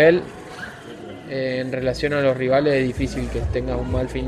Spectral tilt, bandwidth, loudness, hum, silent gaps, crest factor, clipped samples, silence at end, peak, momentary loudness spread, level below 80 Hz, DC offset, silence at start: -6.5 dB/octave; 12.5 kHz; -22 LUFS; none; none; 18 dB; under 0.1%; 0 s; -4 dBFS; 17 LU; -34 dBFS; under 0.1%; 0 s